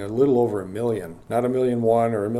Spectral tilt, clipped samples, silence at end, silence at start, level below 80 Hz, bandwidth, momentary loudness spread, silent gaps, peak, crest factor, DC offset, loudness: -8 dB/octave; under 0.1%; 0 s; 0 s; -56 dBFS; 13.5 kHz; 7 LU; none; -8 dBFS; 14 dB; under 0.1%; -22 LUFS